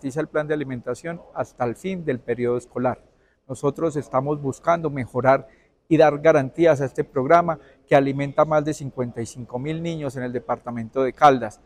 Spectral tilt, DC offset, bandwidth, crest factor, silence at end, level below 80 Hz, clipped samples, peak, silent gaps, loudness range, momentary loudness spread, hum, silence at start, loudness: -7 dB/octave; under 0.1%; 12.5 kHz; 20 dB; 0.1 s; -56 dBFS; under 0.1%; -2 dBFS; none; 7 LU; 13 LU; none; 0.05 s; -22 LUFS